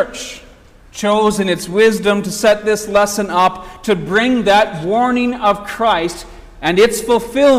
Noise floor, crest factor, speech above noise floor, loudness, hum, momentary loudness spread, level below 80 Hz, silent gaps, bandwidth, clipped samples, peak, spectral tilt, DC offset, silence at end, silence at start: -42 dBFS; 12 dB; 28 dB; -15 LUFS; none; 9 LU; -42 dBFS; none; 16 kHz; under 0.1%; -2 dBFS; -4 dB/octave; under 0.1%; 0 s; 0 s